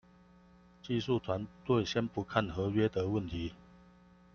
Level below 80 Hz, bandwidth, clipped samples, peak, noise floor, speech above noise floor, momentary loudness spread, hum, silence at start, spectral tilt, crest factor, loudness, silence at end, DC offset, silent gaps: -58 dBFS; 7 kHz; under 0.1%; -12 dBFS; -61 dBFS; 28 dB; 9 LU; none; 0.85 s; -7 dB/octave; 22 dB; -34 LUFS; 0.8 s; under 0.1%; none